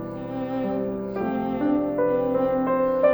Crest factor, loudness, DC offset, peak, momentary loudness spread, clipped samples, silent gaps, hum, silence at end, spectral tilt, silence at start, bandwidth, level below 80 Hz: 16 dB; -25 LUFS; under 0.1%; -8 dBFS; 6 LU; under 0.1%; none; none; 0 s; -10 dB/octave; 0 s; over 20 kHz; -52 dBFS